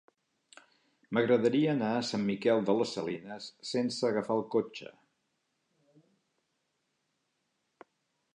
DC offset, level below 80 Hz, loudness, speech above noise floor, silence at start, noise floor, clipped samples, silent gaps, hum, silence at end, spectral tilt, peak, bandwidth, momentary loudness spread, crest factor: under 0.1%; -78 dBFS; -31 LUFS; 50 dB; 1.1 s; -80 dBFS; under 0.1%; none; none; 3.45 s; -5.5 dB/octave; -14 dBFS; 10.5 kHz; 15 LU; 20 dB